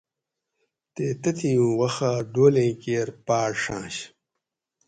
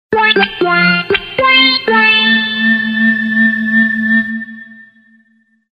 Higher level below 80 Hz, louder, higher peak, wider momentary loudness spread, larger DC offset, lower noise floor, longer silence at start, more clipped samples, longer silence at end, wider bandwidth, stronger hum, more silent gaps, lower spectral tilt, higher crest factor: second, -60 dBFS vs -50 dBFS; second, -24 LUFS vs -10 LUFS; second, -6 dBFS vs 0 dBFS; first, 14 LU vs 6 LU; neither; first, -85 dBFS vs -55 dBFS; first, 0.95 s vs 0.1 s; neither; about the same, 0.8 s vs 0.9 s; first, 9.4 kHz vs 5.6 kHz; neither; neither; about the same, -6 dB/octave vs -6.5 dB/octave; first, 20 dB vs 12 dB